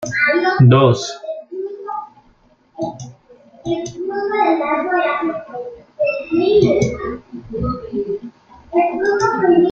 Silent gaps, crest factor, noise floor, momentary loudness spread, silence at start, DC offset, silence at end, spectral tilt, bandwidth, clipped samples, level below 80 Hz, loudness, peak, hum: none; 16 dB; -54 dBFS; 17 LU; 0 s; under 0.1%; 0 s; -6.5 dB/octave; 7.6 kHz; under 0.1%; -44 dBFS; -17 LUFS; -2 dBFS; none